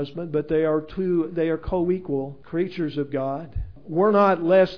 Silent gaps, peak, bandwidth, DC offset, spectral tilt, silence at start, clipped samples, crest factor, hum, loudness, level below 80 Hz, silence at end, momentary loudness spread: none; -8 dBFS; 5.4 kHz; 0.5%; -9 dB/octave; 0 s; under 0.1%; 16 dB; none; -23 LUFS; -42 dBFS; 0 s; 11 LU